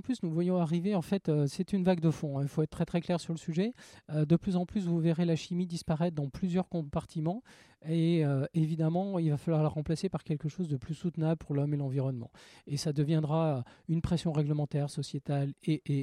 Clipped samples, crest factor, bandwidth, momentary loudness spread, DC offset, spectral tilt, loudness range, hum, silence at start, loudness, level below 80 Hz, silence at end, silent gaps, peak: under 0.1%; 16 dB; 11.5 kHz; 7 LU; under 0.1%; -7.5 dB/octave; 2 LU; none; 0.05 s; -32 LUFS; -58 dBFS; 0 s; none; -14 dBFS